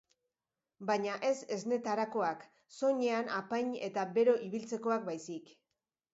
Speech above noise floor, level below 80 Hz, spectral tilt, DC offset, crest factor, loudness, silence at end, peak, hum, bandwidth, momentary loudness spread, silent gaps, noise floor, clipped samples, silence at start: over 56 dB; -86 dBFS; -4 dB/octave; under 0.1%; 18 dB; -34 LUFS; 0.7 s; -18 dBFS; none; 7.6 kHz; 13 LU; none; under -90 dBFS; under 0.1%; 0.8 s